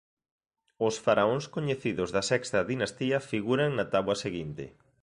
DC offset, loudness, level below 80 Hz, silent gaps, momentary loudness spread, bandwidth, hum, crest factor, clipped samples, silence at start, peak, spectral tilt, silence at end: under 0.1%; -29 LUFS; -60 dBFS; none; 9 LU; 11.5 kHz; none; 20 dB; under 0.1%; 0.8 s; -10 dBFS; -5 dB/octave; 0.35 s